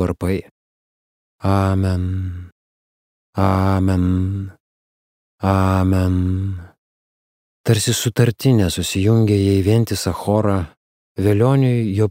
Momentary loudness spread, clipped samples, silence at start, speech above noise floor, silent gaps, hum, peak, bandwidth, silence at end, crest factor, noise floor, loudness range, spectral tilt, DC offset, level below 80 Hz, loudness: 11 LU; under 0.1%; 0 s; over 73 dB; 0.51-1.39 s, 2.52-3.33 s, 4.60-5.38 s, 6.78-7.64 s, 10.77-11.15 s; none; -2 dBFS; 16 kHz; 0 s; 16 dB; under -90 dBFS; 5 LU; -6.5 dB/octave; under 0.1%; -42 dBFS; -18 LUFS